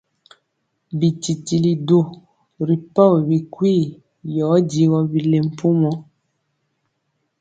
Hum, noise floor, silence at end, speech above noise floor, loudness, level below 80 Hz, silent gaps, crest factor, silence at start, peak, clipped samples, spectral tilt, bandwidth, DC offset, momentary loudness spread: none; -72 dBFS; 1.4 s; 55 dB; -18 LUFS; -60 dBFS; none; 18 dB; 0.9 s; -2 dBFS; under 0.1%; -8 dB/octave; 9.2 kHz; under 0.1%; 12 LU